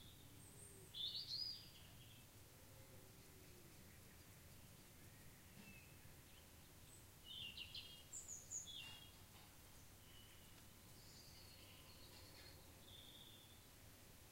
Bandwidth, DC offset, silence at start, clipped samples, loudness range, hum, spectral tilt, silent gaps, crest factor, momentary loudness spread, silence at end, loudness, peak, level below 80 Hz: 16 kHz; under 0.1%; 0 s; under 0.1%; 10 LU; none; -1.5 dB/octave; none; 22 dB; 14 LU; 0 s; -56 LUFS; -38 dBFS; -72 dBFS